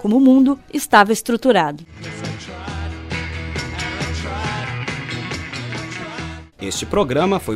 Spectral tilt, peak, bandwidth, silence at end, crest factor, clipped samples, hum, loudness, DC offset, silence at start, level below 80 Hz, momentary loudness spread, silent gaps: -5 dB/octave; 0 dBFS; 16 kHz; 0 s; 20 dB; under 0.1%; none; -19 LUFS; under 0.1%; 0 s; -38 dBFS; 16 LU; none